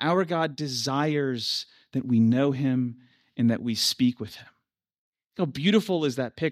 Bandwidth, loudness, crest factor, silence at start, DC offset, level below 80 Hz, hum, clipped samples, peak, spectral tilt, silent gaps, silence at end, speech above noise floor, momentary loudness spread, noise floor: 15.5 kHz; -26 LUFS; 18 dB; 0 s; under 0.1%; -68 dBFS; none; under 0.1%; -8 dBFS; -5.5 dB/octave; 4.98-5.12 s; 0 s; 52 dB; 11 LU; -77 dBFS